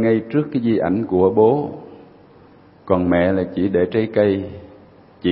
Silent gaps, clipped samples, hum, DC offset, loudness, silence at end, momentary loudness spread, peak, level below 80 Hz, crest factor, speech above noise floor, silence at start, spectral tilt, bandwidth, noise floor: none; under 0.1%; none; under 0.1%; -18 LUFS; 0 s; 10 LU; -2 dBFS; -50 dBFS; 18 dB; 30 dB; 0 s; -12.5 dB/octave; 5 kHz; -47 dBFS